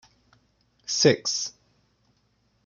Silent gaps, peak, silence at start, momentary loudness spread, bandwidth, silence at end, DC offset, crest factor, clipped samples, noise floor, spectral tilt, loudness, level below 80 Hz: none; -4 dBFS; 0.9 s; 15 LU; 10 kHz; 1.15 s; under 0.1%; 24 dB; under 0.1%; -68 dBFS; -3 dB/octave; -23 LUFS; -70 dBFS